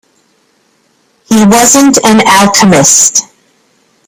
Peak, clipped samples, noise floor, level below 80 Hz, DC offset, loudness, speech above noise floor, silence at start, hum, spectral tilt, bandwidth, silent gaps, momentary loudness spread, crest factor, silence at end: 0 dBFS; 1%; -52 dBFS; -42 dBFS; under 0.1%; -4 LUFS; 47 dB; 1.3 s; none; -3 dB/octave; over 20 kHz; none; 5 LU; 8 dB; 0.85 s